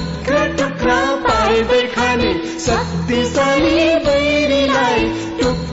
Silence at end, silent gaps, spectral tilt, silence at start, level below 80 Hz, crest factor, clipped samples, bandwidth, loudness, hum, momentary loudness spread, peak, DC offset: 0 s; none; -4.5 dB/octave; 0 s; -32 dBFS; 10 dB; under 0.1%; 8 kHz; -15 LUFS; none; 5 LU; -6 dBFS; under 0.1%